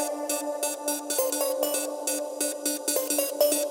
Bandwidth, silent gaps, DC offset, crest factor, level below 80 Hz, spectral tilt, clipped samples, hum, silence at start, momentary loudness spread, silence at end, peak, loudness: 16.5 kHz; none; under 0.1%; 18 dB; under -90 dBFS; 1 dB/octave; under 0.1%; none; 0 s; 5 LU; 0 s; -10 dBFS; -27 LUFS